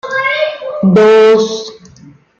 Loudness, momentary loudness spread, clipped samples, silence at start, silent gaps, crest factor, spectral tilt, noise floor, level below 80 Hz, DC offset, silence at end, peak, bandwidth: -10 LUFS; 14 LU; under 0.1%; 0.05 s; none; 10 dB; -6 dB/octave; -40 dBFS; -54 dBFS; under 0.1%; 0.65 s; -2 dBFS; 7.8 kHz